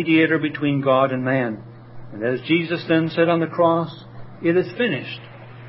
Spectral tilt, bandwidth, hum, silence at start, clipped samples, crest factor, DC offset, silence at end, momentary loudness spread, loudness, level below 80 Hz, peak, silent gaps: -11.5 dB/octave; 5.8 kHz; none; 0 s; under 0.1%; 16 dB; under 0.1%; 0 s; 15 LU; -20 LUFS; -60 dBFS; -4 dBFS; none